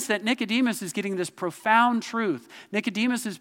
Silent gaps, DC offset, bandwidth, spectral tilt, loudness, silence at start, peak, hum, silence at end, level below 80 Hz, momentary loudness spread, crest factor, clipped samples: none; under 0.1%; 17 kHz; -3.5 dB/octave; -25 LUFS; 0 s; -6 dBFS; none; 0.05 s; -84 dBFS; 9 LU; 20 dB; under 0.1%